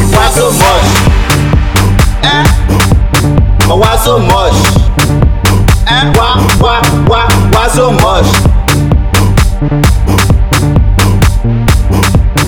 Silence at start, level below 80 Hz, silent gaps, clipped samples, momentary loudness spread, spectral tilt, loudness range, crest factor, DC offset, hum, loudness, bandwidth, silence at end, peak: 0 s; -12 dBFS; none; under 0.1%; 2 LU; -5 dB/octave; 1 LU; 6 dB; 1%; none; -8 LUFS; 19 kHz; 0 s; 0 dBFS